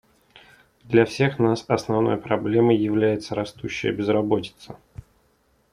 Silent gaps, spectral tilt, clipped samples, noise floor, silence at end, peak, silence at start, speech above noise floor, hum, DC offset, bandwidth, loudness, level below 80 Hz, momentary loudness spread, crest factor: none; -7 dB/octave; under 0.1%; -64 dBFS; 0.95 s; -2 dBFS; 0.85 s; 42 dB; none; under 0.1%; 11 kHz; -22 LUFS; -56 dBFS; 11 LU; 20 dB